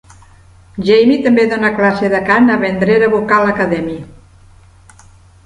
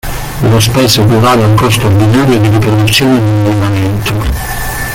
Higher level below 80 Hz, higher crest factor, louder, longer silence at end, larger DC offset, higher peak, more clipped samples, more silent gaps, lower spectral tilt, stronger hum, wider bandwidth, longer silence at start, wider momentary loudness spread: second, -46 dBFS vs -24 dBFS; first, 14 dB vs 8 dB; second, -12 LUFS vs -9 LUFS; first, 1.35 s vs 0 s; neither; about the same, 0 dBFS vs 0 dBFS; neither; neither; first, -7 dB/octave vs -5.5 dB/octave; neither; second, 10.5 kHz vs 17 kHz; first, 0.75 s vs 0.05 s; about the same, 10 LU vs 8 LU